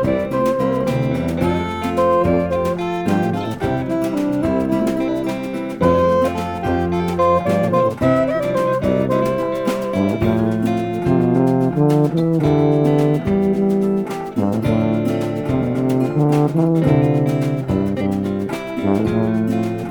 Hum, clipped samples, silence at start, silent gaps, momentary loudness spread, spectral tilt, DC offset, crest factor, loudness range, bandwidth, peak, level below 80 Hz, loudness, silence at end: none; under 0.1%; 0 s; none; 6 LU; -8 dB/octave; under 0.1%; 14 dB; 2 LU; 19 kHz; -2 dBFS; -42 dBFS; -18 LUFS; 0 s